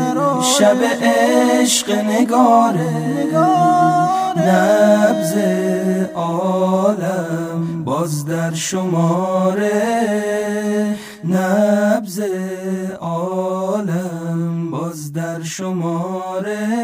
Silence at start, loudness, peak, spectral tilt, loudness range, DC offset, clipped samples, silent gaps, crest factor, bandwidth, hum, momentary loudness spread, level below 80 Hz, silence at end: 0 s; -17 LUFS; -2 dBFS; -5 dB/octave; 8 LU; under 0.1%; under 0.1%; none; 16 dB; 16 kHz; none; 10 LU; -60 dBFS; 0 s